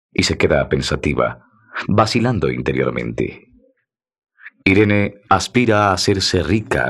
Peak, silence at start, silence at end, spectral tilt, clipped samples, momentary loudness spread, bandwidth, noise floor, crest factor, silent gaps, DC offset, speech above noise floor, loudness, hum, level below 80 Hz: 0 dBFS; 0.2 s; 0 s; -5 dB/octave; under 0.1%; 8 LU; 13 kHz; -67 dBFS; 16 dB; none; under 0.1%; 50 dB; -17 LUFS; none; -40 dBFS